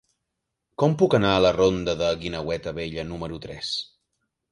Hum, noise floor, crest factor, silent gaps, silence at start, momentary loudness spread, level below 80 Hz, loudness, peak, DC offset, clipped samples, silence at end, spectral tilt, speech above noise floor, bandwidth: none; -81 dBFS; 20 dB; none; 0.8 s; 14 LU; -48 dBFS; -24 LUFS; -6 dBFS; under 0.1%; under 0.1%; 0.65 s; -6 dB/octave; 58 dB; 11 kHz